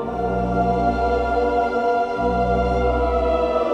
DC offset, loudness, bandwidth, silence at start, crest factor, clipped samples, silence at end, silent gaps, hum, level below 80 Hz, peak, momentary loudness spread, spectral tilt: under 0.1%; -20 LUFS; 8.8 kHz; 0 s; 12 dB; under 0.1%; 0 s; none; none; -30 dBFS; -8 dBFS; 1 LU; -8 dB/octave